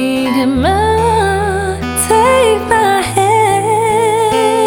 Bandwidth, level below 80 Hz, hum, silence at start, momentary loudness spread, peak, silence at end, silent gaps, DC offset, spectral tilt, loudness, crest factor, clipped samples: 20 kHz; -32 dBFS; none; 0 s; 5 LU; 0 dBFS; 0 s; none; under 0.1%; -4.5 dB/octave; -12 LUFS; 10 dB; under 0.1%